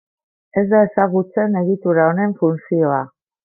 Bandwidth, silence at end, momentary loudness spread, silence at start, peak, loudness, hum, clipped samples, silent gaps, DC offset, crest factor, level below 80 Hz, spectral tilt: 2.3 kHz; 0.35 s; 7 LU; 0.55 s; -2 dBFS; -17 LUFS; none; under 0.1%; none; under 0.1%; 14 dB; -64 dBFS; -13.5 dB/octave